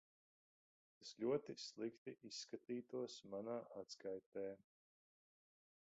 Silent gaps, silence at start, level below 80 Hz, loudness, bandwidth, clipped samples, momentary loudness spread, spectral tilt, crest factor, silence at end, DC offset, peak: 1.98-2.06 s, 4.26-4.32 s; 1 s; under -90 dBFS; -50 LUFS; 8 kHz; under 0.1%; 12 LU; -4.5 dB/octave; 22 dB; 1.4 s; under 0.1%; -30 dBFS